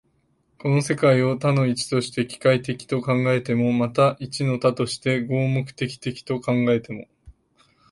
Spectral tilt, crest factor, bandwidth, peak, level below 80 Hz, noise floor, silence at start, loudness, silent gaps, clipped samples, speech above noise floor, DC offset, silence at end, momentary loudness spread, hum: -6.5 dB/octave; 18 dB; 11.5 kHz; -4 dBFS; -58 dBFS; -66 dBFS; 0.65 s; -22 LUFS; none; under 0.1%; 44 dB; under 0.1%; 0.6 s; 9 LU; none